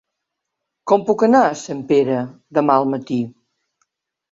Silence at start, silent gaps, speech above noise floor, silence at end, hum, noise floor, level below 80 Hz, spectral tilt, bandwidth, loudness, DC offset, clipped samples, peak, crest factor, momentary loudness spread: 0.85 s; none; 63 dB; 1.05 s; none; -79 dBFS; -64 dBFS; -6.5 dB/octave; 7.8 kHz; -18 LUFS; under 0.1%; under 0.1%; -2 dBFS; 18 dB; 11 LU